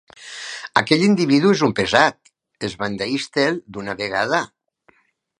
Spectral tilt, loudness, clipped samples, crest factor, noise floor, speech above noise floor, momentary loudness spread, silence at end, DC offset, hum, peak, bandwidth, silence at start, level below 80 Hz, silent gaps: -5 dB/octave; -19 LUFS; under 0.1%; 20 dB; -60 dBFS; 41 dB; 15 LU; 0.95 s; under 0.1%; none; 0 dBFS; 11 kHz; 0.2 s; -56 dBFS; none